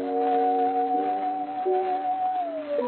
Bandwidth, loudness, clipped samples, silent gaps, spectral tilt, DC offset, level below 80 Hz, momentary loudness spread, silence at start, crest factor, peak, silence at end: 4.3 kHz; -26 LUFS; under 0.1%; none; -3 dB/octave; under 0.1%; -76 dBFS; 6 LU; 0 s; 12 dB; -14 dBFS; 0 s